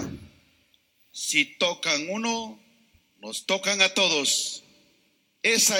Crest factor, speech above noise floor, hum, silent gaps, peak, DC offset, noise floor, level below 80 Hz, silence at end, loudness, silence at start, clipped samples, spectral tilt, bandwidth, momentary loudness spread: 22 dB; 42 dB; none; none; -4 dBFS; under 0.1%; -67 dBFS; -64 dBFS; 0 s; -24 LUFS; 0 s; under 0.1%; -1 dB/octave; 19 kHz; 20 LU